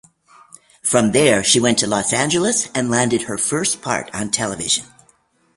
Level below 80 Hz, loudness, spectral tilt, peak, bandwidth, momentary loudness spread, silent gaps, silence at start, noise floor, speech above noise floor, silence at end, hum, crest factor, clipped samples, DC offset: -52 dBFS; -17 LUFS; -3 dB/octave; 0 dBFS; 11.5 kHz; 8 LU; none; 0.85 s; -58 dBFS; 40 dB; 0.75 s; none; 20 dB; under 0.1%; under 0.1%